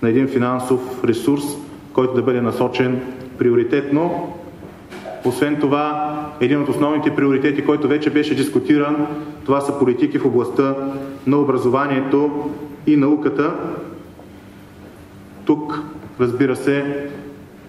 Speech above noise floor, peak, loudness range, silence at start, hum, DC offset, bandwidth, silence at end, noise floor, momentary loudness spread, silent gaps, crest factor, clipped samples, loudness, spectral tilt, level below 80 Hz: 22 dB; -2 dBFS; 5 LU; 0 s; none; under 0.1%; 14 kHz; 0 s; -40 dBFS; 12 LU; none; 18 dB; under 0.1%; -19 LUFS; -7 dB/octave; -54 dBFS